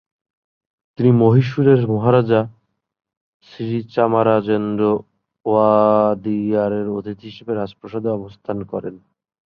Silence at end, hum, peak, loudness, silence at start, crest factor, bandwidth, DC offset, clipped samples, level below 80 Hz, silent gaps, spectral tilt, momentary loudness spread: 0.5 s; none; -2 dBFS; -18 LUFS; 1 s; 16 dB; 6 kHz; under 0.1%; under 0.1%; -56 dBFS; 3.17-3.40 s; -10 dB/octave; 14 LU